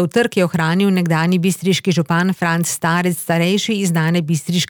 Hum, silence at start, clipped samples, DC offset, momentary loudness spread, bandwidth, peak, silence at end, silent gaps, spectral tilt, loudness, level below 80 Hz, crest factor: none; 0 s; under 0.1%; under 0.1%; 2 LU; over 20 kHz; -4 dBFS; 0.05 s; none; -5 dB/octave; -17 LUFS; -62 dBFS; 12 dB